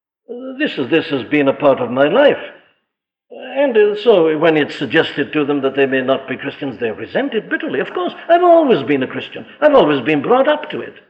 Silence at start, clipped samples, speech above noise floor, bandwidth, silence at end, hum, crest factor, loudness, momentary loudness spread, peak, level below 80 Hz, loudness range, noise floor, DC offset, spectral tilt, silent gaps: 0.3 s; under 0.1%; 61 dB; 8 kHz; 0.2 s; none; 14 dB; -15 LUFS; 13 LU; -2 dBFS; -60 dBFS; 4 LU; -76 dBFS; under 0.1%; -7.5 dB/octave; none